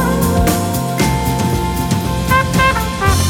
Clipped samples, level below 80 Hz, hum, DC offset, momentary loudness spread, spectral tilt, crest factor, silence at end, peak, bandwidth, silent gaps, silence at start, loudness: under 0.1%; -24 dBFS; none; under 0.1%; 4 LU; -5 dB/octave; 14 dB; 0 s; -2 dBFS; 18 kHz; none; 0 s; -15 LUFS